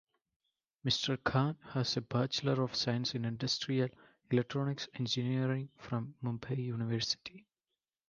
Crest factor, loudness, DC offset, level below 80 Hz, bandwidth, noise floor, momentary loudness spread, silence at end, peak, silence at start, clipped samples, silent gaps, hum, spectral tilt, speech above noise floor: 20 dB; -35 LUFS; under 0.1%; -68 dBFS; 7.4 kHz; under -90 dBFS; 7 LU; 0.7 s; -16 dBFS; 0.85 s; under 0.1%; none; none; -5.5 dB/octave; over 55 dB